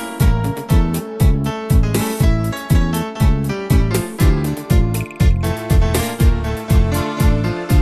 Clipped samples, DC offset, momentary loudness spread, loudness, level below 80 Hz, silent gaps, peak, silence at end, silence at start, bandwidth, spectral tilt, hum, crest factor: under 0.1%; under 0.1%; 4 LU; -17 LUFS; -18 dBFS; none; -2 dBFS; 0 s; 0 s; 13.5 kHz; -6.5 dB/octave; none; 14 dB